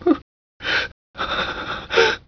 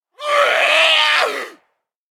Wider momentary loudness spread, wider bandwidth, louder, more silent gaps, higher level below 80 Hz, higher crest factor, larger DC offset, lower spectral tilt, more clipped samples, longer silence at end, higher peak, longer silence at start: about the same, 12 LU vs 14 LU; second, 5.4 kHz vs 18 kHz; second, -22 LUFS vs -13 LUFS; first, 0.22-0.60 s, 0.92-1.14 s vs none; first, -46 dBFS vs -80 dBFS; about the same, 18 dB vs 16 dB; neither; first, -3.5 dB/octave vs 2.5 dB/octave; neither; second, 0.1 s vs 0.6 s; second, -4 dBFS vs 0 dBFS; second, 0 s vs 0.2 s